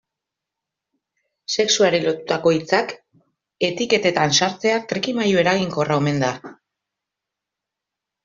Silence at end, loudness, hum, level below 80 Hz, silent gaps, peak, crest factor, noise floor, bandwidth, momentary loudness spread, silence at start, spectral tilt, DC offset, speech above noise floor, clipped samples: 1.7 s; -19 LUFS; none; -62 dBFS; none; -4 dBFS; 18 dB; -85 dBFS; 7.6 kHz; 8 LU; 1.5 s; -4 dB/octave; under 0.1%; 65 dB; under 0.1%